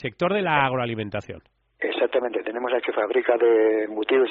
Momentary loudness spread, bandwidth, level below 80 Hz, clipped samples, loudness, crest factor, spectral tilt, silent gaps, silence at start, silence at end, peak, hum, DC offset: 12 LU; 5.6 kHz; -62 dBFS; under 0.1%; -23 LUFS; 18 dB; -3.5 dB/octave; none; 0 s; 0 s; -4 dBFS; none; under 0.1%